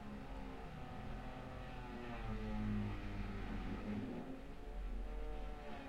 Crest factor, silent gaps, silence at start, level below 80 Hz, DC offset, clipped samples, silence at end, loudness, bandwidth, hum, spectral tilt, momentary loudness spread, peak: 16 dB; none; 0 s; -48 dBFS; under 0.1%; under 0.1%; 0 s; -48 LUFS; 10.5 kHz; none; -7.5 dB/octave; 8 LU; -30 dBFS